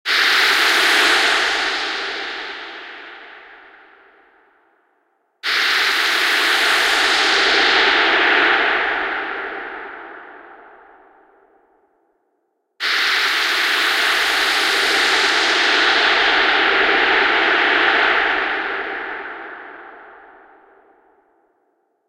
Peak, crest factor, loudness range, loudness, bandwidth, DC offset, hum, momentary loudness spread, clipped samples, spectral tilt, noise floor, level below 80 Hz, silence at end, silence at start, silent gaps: -2 dBFS; 18 dB; 15 LU; -15 LUFS; 16 kHz; under 0.1%; none; 17 LU; under 0.1%; 0.5 dB/octave; -69 dBFS; -54 dBFS; 1.95 s; 0.05 s; none